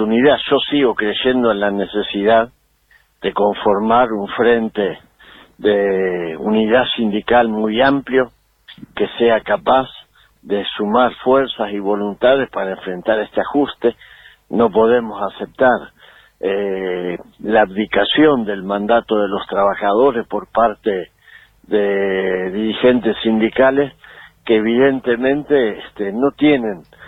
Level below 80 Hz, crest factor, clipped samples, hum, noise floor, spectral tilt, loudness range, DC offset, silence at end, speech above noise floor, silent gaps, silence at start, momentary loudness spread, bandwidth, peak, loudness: -50 dBFS; 14 dB; under 0.1%; none; -55 dBFS; -7.5 dB/octave; 2 LU; under 0.1%; 0 s; 39 dB; none; 0 s; 9 LU; 4.8 kHz; -2 dBFS; -16 LUFS